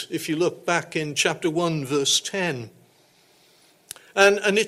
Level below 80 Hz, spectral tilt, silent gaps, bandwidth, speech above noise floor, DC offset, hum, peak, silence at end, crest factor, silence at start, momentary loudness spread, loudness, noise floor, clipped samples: -68 dBFS; -3 dB/octave; none; 16 kHz; 36 dB; under 0.1%; none; -4 dBFS; 0 s; 20 dB; 0 s; 15 LU; -22 LUFS; -58 dBFS; under 0.1%